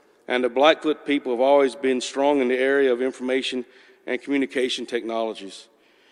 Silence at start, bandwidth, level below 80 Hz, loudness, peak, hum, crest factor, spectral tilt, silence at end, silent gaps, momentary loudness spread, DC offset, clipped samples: 0.3 s; 11.5 kHz; -72 dBFS; -22 LUFS; -4 dBFS; none; 20 dB; -3 dB/octave; 0.5 s; none; 12 LU; under 0.1%; under 0.1%